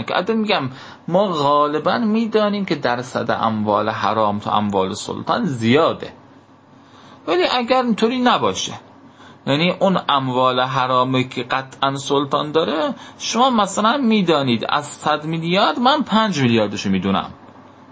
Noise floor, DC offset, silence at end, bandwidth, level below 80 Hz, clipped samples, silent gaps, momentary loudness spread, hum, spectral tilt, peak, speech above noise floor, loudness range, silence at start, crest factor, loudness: -47 dBFS; under 0.1%; 0.3 s; 8 kHz; -56 dBFS; under 0.1%; none; 7 LU; none; -5 dB/octave; -2 dBFS; 29 dB; 3 LU; 0 s; 16 dB; -18 LUFS